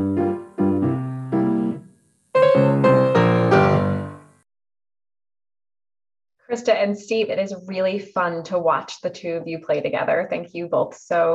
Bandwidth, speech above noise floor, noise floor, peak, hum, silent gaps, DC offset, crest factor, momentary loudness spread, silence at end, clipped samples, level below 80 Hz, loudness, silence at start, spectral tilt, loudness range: 10 kHz; 31 dB; -54 dBFS; -4 dBFS; none; none; under 0.1%; 18 dB; 12 LU; 0 s; under 0.1%; -62 dBFS; -21 LUFS; 0 s; -7.5 dB/octave; 8 LU